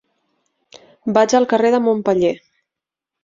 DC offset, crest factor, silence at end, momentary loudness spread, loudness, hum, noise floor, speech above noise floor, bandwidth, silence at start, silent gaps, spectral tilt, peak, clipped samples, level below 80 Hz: under 0.1%; 18 dB; 0.85 s; 9 LU; -16 LUFS; none; -85 dBFS; 70 dB; 7.6 kHz; 1.05 s; none; -5 dB/octave; 0 dBFS; under 0.1%; -60 dBFS